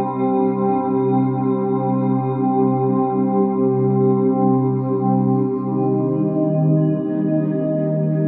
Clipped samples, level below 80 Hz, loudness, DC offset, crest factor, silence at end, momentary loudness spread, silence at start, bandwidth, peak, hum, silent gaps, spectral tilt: under 0.1%; -60 dBFS; -18 LUFS; under 0.1%; 12 dB; 0 s; 3 LU; 0 s; 3.9 kHz; -6 dBFS; none; none; -14.5 dB/octave